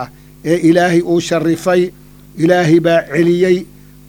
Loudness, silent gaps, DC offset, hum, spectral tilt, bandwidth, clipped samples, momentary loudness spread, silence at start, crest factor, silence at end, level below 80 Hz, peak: -13 LUFS; none; under 0.1%; none; -6.5 dB/octave; 16 kHz; under 0.1%; 7 LU; 0 s; 14 dB; 0.45 s; -46 dBFS; 0 dBFS